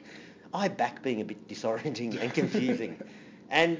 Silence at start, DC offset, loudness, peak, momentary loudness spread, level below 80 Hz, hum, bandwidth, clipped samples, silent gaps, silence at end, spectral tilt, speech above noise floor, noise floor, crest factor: 0 s; under 0.1%; -31 LUFS; -10 dBFS; 18 LU; -74 dBFS; none; 7.6 kHz; under 0.1%; none; 0 s; -5.5 dB/octave; 20 dB; -50 dBFS; 22 dB